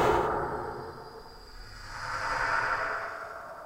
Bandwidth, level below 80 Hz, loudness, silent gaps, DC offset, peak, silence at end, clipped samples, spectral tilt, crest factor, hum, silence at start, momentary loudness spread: 16 kHz; -48 dBFS; -31 LUFS; none; under 0.1%; -14 dBFS; 0 s; under 0.1%; -4.5 dB/octave; 18 dB; none; 0 s; 19 LU